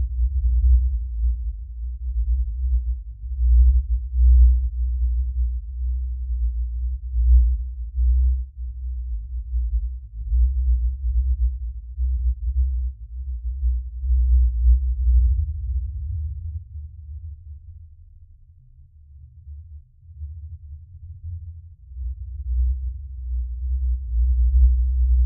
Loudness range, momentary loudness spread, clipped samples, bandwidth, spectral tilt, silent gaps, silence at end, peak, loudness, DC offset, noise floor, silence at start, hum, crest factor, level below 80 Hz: 19 LU; 19 LU; under 0.1%; 0.2 kHz; -27 dB/octave; none; 0 s; -6 dBFS; -24 LUFS; under 0.1%; -49 dBFS; 0 s; none; 16 dB; -22 dBFS